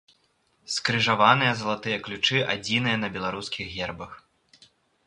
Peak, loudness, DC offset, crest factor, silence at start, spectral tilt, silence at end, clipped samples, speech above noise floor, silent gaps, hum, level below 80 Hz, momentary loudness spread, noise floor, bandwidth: -2 dBFS; -24 LUFS; under 0.1%; 24 dB; 0.7 s; -4 dB/octave; 0.9 s; under 0.1%; 43 dB; none; none; -58 dBFS; 13 LU; -68 dBFS; 11.5 kHz